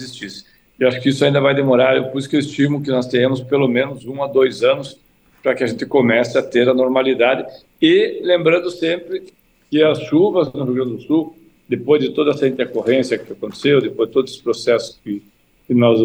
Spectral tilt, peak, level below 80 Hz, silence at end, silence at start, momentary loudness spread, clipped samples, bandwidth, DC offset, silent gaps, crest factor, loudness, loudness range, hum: -6 dB/octave; -2 dBFS; -60 dBFS; 0 s; 0 s; 11 LU; under 0.1%; 10 kHz; under 0.1%; none; 16 dB; -17 LUFS; 3 LU; none